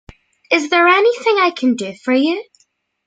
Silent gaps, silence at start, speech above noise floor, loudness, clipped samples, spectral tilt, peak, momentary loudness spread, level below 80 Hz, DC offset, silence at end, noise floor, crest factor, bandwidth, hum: none; 0.5 s; 47 dB; -15 LUFS; under 0.1%; -3.5 dB/octave; 0 dBFS; 8 LU; -56 dBFS; under 0.1%; 0.65 s; -62 dBFS; 16 dB; 9.2 kHz; none